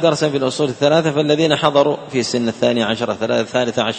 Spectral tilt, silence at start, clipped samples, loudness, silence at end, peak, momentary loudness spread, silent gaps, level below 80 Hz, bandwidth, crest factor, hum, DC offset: -5 dB/octave; 0 s; under 0.1%; -17 LUFS; 0 s; 0 dBFS; 5 LU; none; -56 dBFS; 8.8 kHz; 16 dB; none; under 0.1%